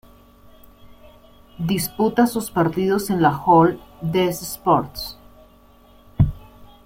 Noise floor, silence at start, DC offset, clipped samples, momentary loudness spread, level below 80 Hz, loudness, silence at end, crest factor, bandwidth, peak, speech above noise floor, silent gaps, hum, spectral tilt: -50 dBFS; 0.85 s; under 0.1%; under 0.1%; 15 LU; -40 dBFS; -20 LUFS; 0.2 s; 18 dB; 16.5 kHz; -4 dBFS; 31 dB; none; none; -6 dB/octave